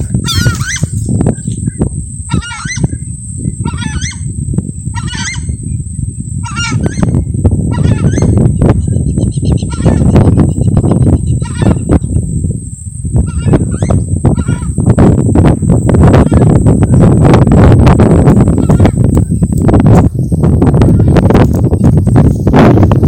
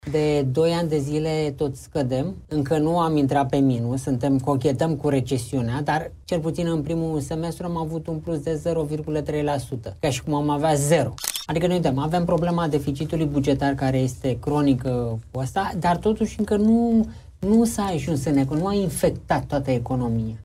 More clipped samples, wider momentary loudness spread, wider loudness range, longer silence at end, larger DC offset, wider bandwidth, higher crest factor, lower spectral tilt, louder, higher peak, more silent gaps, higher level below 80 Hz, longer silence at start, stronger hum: first, 0.2% vs under 0.1%; first, 12 LU vs 7 LU; first, 10 LU vs 4 LU; about the same, 0 s vs 0 s; neither; about the same, 16 kHz vs 16 kHz; second, 8 dB vs 16 dB; about the same, -7 dB/octave vs -6.5 dB/octave; first, -9 LUFS vs -23 LUFS; first, 0 dBFS vs -6 dBFS; neither; first, -18 dBFS vs -44 dBFS; about the same, 0 s vs 0.05 s; neither